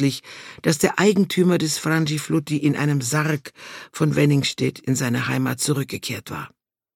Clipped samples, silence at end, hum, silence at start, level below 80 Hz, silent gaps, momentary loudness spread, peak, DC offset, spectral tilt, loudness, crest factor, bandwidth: under 0.1%; 0.5 s; none; 0 s; -60 dBFS; none; 15 LU; -4 dBFS; under 0.1%; -5 dB/octave; -21 LUFS; 18 dB; 17 kHz